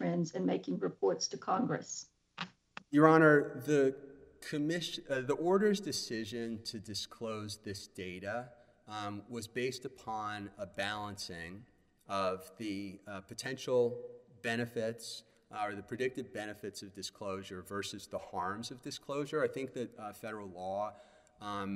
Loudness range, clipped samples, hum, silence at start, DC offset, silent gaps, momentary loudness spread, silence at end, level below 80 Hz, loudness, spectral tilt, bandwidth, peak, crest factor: 11 LU; under 0.1%; none; 0 s; under 0.1%; none; 15 LU; 0 s; -72 dBFS; -36 LUFS; -5 dB/octave; 15.5 kHz; -10 dBFS; 26 dB